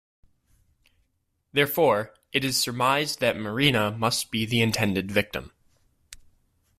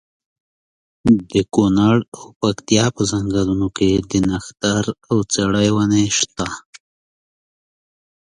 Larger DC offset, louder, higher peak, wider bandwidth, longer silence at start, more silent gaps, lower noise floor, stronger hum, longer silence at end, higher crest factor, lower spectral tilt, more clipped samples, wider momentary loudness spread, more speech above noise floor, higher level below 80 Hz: neither; second, -24 LUFS vs -18 LUFS; second, -6 dBFS vs 0 dBFS; first, 16 kHz vs 11 kHz; first, 1.55 s vs 1.05 s; second, none vs 2.08-2.12 s, 2.36-2.40 s; second, -74 dBFS vs under -90 dBFS; neither; second, 0.65 s vs 1.75 s; about the same, 22 dB vs 18 dB; about the same, -4 dB/octave vs -5 dB/octave; neither; about the same, 6 LU vs 7 LU; second, 50 dB vs over 73 dB; second, -56 dBFS vs -42 dBFS